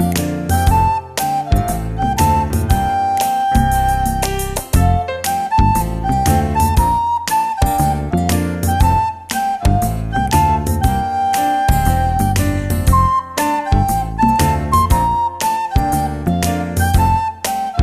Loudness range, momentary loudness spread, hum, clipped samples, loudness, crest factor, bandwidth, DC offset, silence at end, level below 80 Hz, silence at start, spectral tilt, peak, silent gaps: 1 LU; 5 LU; none; under 0.1%; -16 LUFS; 14 dB; 14 kHz; under 0.1%; 0 s; -22 dBFS; 0 s; -5.5 dB/octave; -2 dBFS; none